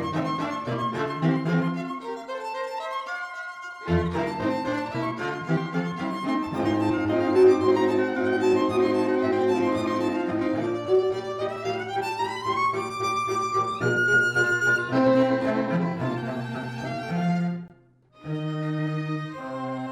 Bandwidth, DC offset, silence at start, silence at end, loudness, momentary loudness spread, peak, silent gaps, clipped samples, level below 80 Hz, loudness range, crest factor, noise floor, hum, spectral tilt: 13.5 kHz; under 0.1%; 0 s; 0 s; -25 LUFS; 11 LU; -8 dBFS; none; under 0.1%; -54 dBFS; 7 LU; 16 dB; -56 dBFS; none; -6.5 dB/octave